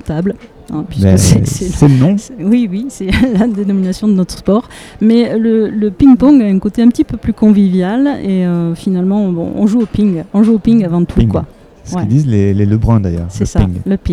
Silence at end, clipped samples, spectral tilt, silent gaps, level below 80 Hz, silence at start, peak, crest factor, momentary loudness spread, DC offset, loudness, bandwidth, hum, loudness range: 0 s; 0.4%; -7 dB/octave; none; -28 dBFS; 0.05 s; 0 dBFS; 10 dB; 9 LU; under 0.1%; -12 LUFS; 14 kHz; none; 3 LU